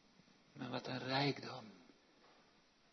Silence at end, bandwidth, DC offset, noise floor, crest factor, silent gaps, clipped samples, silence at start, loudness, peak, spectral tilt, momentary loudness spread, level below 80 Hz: 0.6 s; 6.2 kHz; under 0.1%; -71 dBFS; 22 dB; none; under 0.1%; 0.55 s; -42 LUFS; -24 dBFS; -3.5 dB/octave; 24 LU; -84 dBFS